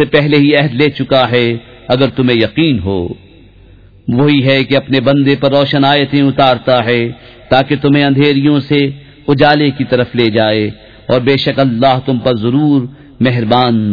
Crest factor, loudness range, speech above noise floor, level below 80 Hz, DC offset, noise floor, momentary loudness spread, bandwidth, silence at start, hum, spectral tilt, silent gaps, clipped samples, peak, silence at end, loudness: 12 dB; 2 LU; 29 dB; -42 dBFS; under 0.1%; -40 dBFS; 7 LU; 5.4 kHz; 0 s; none; -8.5 dB/octave; none; 0.1%; 0 dBFS; 0 s; -11 LUFS